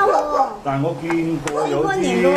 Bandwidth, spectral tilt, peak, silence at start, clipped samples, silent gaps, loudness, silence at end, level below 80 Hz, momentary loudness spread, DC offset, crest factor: 14 kHz; -6 dB/octave; -4 dBFS; 0 s; under 0.1%; none; -20 LUFS; 0 s; -48 dBFS; 5 LU; under 0.1%; 14 dB